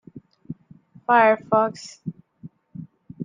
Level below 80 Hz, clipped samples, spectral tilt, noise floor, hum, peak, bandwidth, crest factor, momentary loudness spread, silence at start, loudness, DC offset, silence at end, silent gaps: -68 dBFS; under 0.1%; -6 dB/octave; -51 dBFS; none; -4 dBFS; 9.6 kHz; 20 dB; 25 LU; 0.15 s; -19 LUFS; under 0.1%; 0 s; none